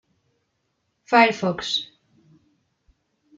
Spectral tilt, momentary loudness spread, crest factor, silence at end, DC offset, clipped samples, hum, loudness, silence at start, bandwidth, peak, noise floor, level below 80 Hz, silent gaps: -4 dB/octave; 10 LU; 22 dB; 1.5 s; under 0.1%; under 0.1%; none; -20 LUFS; 1.1 s; 7.8 kHz; -4 dBFS; -73 dBFS; -66 dBFS; none